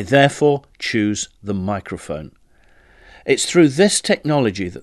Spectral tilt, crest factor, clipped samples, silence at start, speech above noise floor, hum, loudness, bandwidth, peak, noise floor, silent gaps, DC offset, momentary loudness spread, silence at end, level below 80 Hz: -4.5 dB/octave; 18 dB; under 0.1%; 0 s; 34 dB; none; -18 LUFS; 12.5 kHz; 0 dBFS; -52 dBFS; none; under 0.1%; 15 LU; 0 s; -46 dBFS